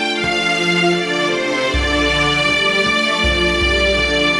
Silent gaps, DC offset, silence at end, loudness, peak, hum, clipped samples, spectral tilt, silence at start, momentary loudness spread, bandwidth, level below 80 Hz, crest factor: none; under 0.1%; 0 s; -15 LUFS; -4 dBFS; none; under 0.1%; -3.5 dB/octave; 0 s; 3 LU; 11.5 kHz; -28 dBFS; 12 dB